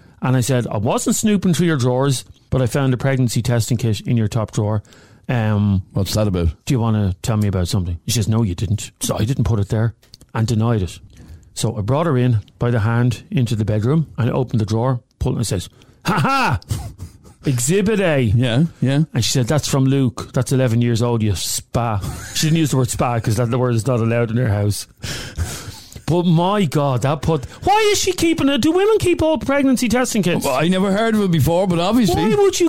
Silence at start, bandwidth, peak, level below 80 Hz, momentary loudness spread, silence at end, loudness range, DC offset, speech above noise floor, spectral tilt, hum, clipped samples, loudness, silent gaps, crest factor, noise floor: 0 s; 16.5 kHz; -6 dBFS; -38 dBFS; 8 LU; 0 s; 4 LU; 0.7%; 20 dB; -5.5 dB/octave; none; under 0.1%; -18 LUFS; none; 10 dB; -37 dBFS